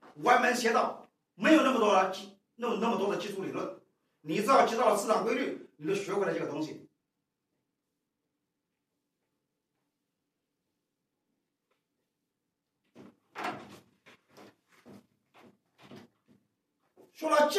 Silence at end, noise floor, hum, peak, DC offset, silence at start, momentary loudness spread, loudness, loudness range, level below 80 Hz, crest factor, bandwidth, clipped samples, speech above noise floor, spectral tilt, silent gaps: 0 s; -85 dBFS; none; -10 dBFS; under 0.1%; 0.15 s; 17 LU; -29 LUFS; 19 LU; -88 dBFS; 22 dB; 15.5 kHz; under 0.1%; 57 dB; -4 dB/octave; none